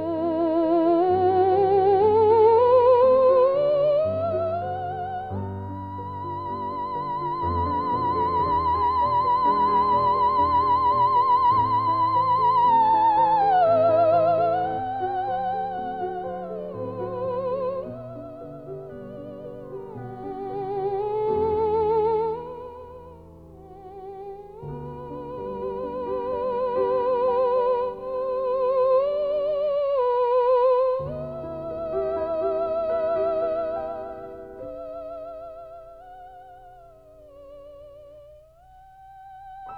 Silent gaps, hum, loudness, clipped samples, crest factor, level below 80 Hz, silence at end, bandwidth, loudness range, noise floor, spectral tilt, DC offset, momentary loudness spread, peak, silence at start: none; none; -22 LUFS; under 0.1%; 16 dB; -52 dBFS; 0 s; 5.2 kHz; 15 LU; -51 dBFS; -9 dB/octave; 0.1%; 19 LU; -8 dBFS; 0 s